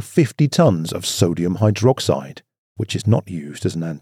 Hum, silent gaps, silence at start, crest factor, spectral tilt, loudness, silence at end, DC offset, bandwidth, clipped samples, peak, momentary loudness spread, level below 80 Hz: none; 2.58-2.75 s; 0 s; 18 dB; -6 dB/octave; -19 LUFS; 0.05 s; under 0.1%; 15.5 kHz; under 0.1%; 0 dBFS; 10 LU; -56 dBFS